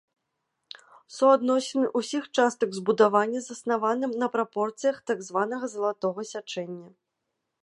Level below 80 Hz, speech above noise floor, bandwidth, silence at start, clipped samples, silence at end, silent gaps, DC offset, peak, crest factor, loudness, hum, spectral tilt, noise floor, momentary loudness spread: -80 dBFS; 56 dB; 11.5 kHz; 1.1 s; under 0.1%; 0.75 s; none; under 0.1%; -6 dBFS; 20 dB; -26 LUFS; none; -4.5 dB/octave; -81 dBFS; 17 LU